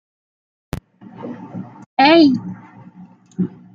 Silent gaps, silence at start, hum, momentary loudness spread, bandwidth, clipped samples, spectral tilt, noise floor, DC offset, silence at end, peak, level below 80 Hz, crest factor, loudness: 1.86-1.97 s; 0.75 s; none; 24 LU; 7.2 kHz; under 0.1%; -6.5 dB/octave; -44 dBFS; under 0.1%; 0.25 s; 0 dBFS; -50 dBFS; 18 dB; -15 LUFS